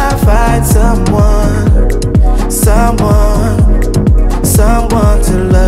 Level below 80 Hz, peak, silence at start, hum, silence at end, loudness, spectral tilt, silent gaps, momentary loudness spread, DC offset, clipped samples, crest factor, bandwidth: -10 dBFS; 0 dBFS; 0 s; none; 0 s; -10 LUFS; -6 dB/octave; none; 2 LU; under 0.1%; under 0.1%; 8 dB; 15.5 kHz